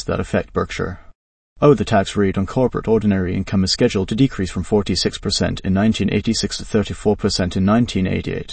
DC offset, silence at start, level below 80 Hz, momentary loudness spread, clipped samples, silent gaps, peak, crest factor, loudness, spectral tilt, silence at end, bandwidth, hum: under 0.1%; 0 s; -38 dBFS; 5 LU; under 0.1%; 1.15-1.56 s; 0 dBFS; 18 dB; -19 LUFS; -5.5 dB/octave; 0 s; 8.8 kHz; none